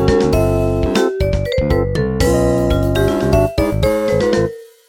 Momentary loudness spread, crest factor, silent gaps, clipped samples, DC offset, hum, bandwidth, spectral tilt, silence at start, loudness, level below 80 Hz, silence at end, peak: 3 LU; 14 dB; none; under 0.1%; under 0.1%; none; 17 kHz; -6.5 dB/octave; 0 s; -16 LUFS; -24 dBFS; 0.2 s; 0 dBFS